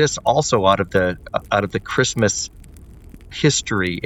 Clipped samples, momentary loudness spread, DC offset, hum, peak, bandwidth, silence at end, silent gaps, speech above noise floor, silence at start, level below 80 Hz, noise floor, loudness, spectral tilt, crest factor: under 0.1%; 8 LU; under 0.1%; none; -2 dBFS; 17.5 kHz; 0 s; none; 22 dB; 0 s; -42 dBFS; -41 dBFS; -19 LUFS; -4 dB/octave; 18 dB